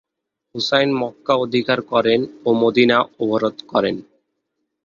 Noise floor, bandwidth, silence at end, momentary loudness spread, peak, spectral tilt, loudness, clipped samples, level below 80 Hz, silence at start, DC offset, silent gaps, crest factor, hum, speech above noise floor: -80 dBFS; 7.4 kHz; 0.85 s; 8 LU; -2 dBFS; -5.5 dB/octave; -18 LUFS; under 0.1%; -60 dBFS; 0.55 s; under 0.1%; none; 18 dB; none; 61 dB